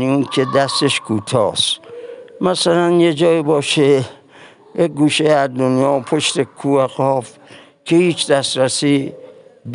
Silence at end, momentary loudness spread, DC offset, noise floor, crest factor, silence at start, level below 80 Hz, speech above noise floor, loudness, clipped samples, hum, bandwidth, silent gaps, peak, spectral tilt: 0 s; 10 LU; under 0.1%; -43 dBFS; 14 dB; 0 s; -62 dBFS; 28 dB; -16 LUFS; under 0.1%; none; 11.5 kHz; none; -2 dBFS; -4.5 dB/octave